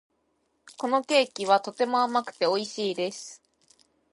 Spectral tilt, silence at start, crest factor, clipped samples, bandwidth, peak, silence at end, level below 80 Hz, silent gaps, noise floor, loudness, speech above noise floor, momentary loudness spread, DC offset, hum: -3 dB/octave; 0.8 s; 22 dB; under 0.1%; 11.5 kHz; -6 dBFS; 0.8 s; -82 dBFS; none; -73 dBFS; -26 LUFS; 47 dB; 10 LU; under 0.1%; none